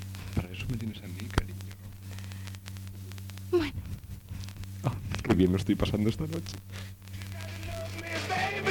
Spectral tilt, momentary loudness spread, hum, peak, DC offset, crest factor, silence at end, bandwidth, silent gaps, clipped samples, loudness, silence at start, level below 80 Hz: -6 dB/octave; 15 LU; none; -10 dBFS; under 0.1%; 22 dB; 0 s; 19 kHz; none; under 0.1%; -33 LUFS; 0 s; -46 dBFS